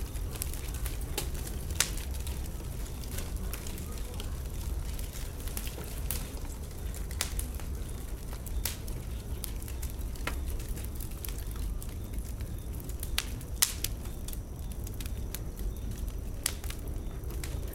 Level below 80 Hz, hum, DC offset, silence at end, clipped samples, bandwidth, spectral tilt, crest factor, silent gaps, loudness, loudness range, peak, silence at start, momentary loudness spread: -38 dBFS; none; under 0.1%; 0 s; under 0.1%; 17 kHz; -3.5 dB/octave; 34 dB; none; -37 LUFS; 4 LU; -2 dBFS; 0 s; 6 LU